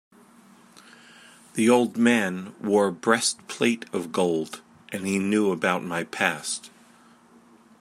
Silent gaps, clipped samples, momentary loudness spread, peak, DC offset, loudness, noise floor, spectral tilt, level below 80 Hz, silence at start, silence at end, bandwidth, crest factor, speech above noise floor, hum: none; under 0.1%; 12 LU; -4 dBFS; under 0.1%; -24 LUFS; -55 dBFS; -4 dB/octave; -72 dBFS; 1.55 s; 1.15 s; 15 kHz; 22 dB; 31 dB; none